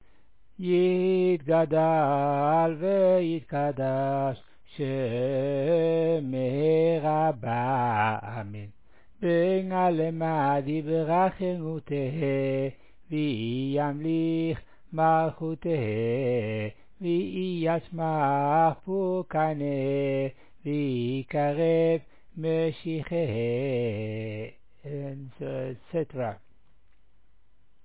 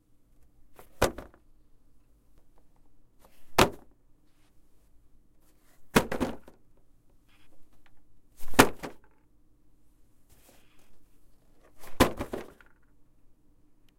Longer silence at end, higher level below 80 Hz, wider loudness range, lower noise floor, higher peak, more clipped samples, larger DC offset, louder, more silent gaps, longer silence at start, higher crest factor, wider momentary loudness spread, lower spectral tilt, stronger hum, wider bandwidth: about the same, 1.45 s vs 1.5 s; second, -62 dBFS vs -48 dBFS; about the same, 6 LU vs 4 LU; first, -66 dBFS vs -61 dBFS; second, -12 dBFS vs 0 dBFS; neither; first, 0.3% vs under 0.1%; about the same, -27 LUFS vs -28 LUFS; neither; about the same, 0.6 s vs 0.7 s; second, 14 dB vs 34 dB; second, 12 LU vs 28 LU; first, -11.5 dB/octave vs -4 dB/octave; neither; second, 4 kHz vs 16.5 kHz